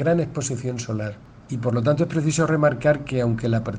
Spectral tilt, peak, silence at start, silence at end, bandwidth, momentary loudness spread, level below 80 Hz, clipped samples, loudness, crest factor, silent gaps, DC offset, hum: -6.5 dB/octave; -6 dBFS; 0 s; 0 s; 9.8 kHz; 10 LU; -50 dBFS; under 0.1%; -22 LUFS; 16 dB; none; under 0.1%; none